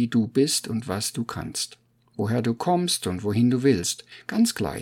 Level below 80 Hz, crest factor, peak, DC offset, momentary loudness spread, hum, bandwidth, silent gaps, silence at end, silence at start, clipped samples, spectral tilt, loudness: -56 dBFS; 16 dB; -8 dBFS; under 0.1%; 9 LU; none; 17.5 kHz; none; 0 s; 0 s; under 0.1%; -4.5 dB/octave; -24 LUFS